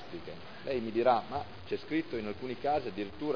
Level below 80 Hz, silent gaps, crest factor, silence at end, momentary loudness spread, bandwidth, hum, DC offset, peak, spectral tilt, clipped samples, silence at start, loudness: -62 dBFS; none; 20 dB; 0 s; 15 LU; 5.4 kHz; none; 0.4%; -14 dBFS; -7.5 dB/octave; under 0.1%; 0 s; -34 LUFS